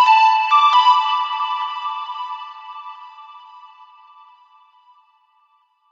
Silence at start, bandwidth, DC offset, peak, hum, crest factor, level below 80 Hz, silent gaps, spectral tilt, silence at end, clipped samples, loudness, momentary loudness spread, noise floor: 0 s; 7.4 kHz; under 0.1%; -4 dBFS; none; 16 dB; under -90 dBFS; none; 8 dB/octave; 2.25 s; under 0.1%; -16 LUFS; 23 LU; -61 dBFS